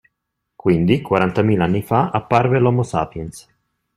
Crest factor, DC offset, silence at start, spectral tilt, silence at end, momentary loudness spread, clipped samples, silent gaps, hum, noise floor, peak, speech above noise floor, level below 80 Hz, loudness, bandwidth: 18 dB; under 0.1%; 0.65 s; -7.5 dB/octave; 0.55 s; 8 LU; under 0.1%; none; none; -77 dBFS; 0 dBFS; 60 dB; -48 dBFS; -18 LUFS; 14 kHz